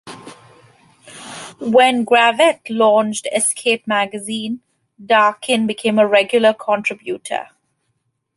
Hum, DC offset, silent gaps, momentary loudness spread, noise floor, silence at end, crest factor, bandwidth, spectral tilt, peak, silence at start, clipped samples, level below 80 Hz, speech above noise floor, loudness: none; under 0.1%; none; 16 LU; -70 dBFS; 0.9 s; 16 dB; 11.5 kHz; -3 dB/octave; -2 dBFS; 0.05 s; under 0.1%; -68 dBFS; 54 dB; -16 LUFS